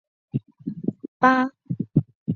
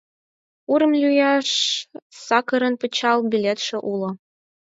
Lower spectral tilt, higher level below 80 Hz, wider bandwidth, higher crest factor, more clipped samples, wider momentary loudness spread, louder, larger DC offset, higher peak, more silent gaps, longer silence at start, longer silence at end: first, -8 dB/octave vs -3.5 dB/octave; first, -58 dBFS vs -74 dBFS; second, 6.8 kHz vs 8 kHz; about the same, 22 dB vs 18 dB; neither; about the same, 14 LU vs 15 LU; second, -24 LUFS vs -20 LUFS; neither; about the same, -4 dBFS vs -4 dBFS; first, 1.08-1.20 s, 2.15-2.26 s vs 2.02-2.10 s; second, 0.35 s vs 0.7 s; second, 0 s vs 0.5 s